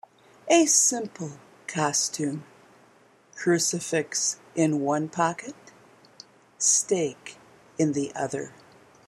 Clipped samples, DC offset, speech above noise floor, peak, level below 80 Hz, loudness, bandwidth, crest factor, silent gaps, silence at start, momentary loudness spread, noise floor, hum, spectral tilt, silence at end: under 0.1%; under 0.1%; 33 dB; -6 dBFS; -74 dBFS; -24 LUFS; 15 kHz; 22 dB; none; 0.45 s; 20 LU; -58 dBFS; none; -3 dB/octave; 0.6 s